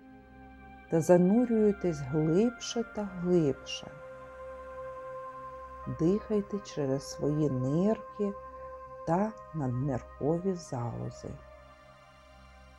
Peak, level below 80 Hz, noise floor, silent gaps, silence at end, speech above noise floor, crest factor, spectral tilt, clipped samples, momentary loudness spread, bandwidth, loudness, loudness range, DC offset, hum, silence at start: -10 dBFS; -56 dBFS; -55 dBFS; none; 0.1 s; 26 dB; 22 dB; -7 dB/octave; under 0.1%; 19 LU; 12.5 kHz; -31 LUFS; 7 LU; under 0.1%; none; 0 s